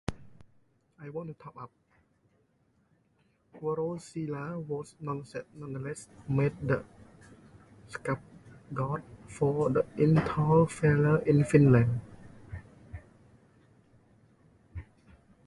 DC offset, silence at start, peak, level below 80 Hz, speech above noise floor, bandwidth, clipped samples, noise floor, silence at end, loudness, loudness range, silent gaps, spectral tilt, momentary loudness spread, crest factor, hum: under 0.1%; 0.1 s; -8 dBFS; -56 dBFS; 42 dB; 11.5 kHz; under 0.1%; -70 dBFS; 0.65 s; -29 LUFS; 15 LU; none; -8.5 dB/octave; 23 LU; 24 dB; none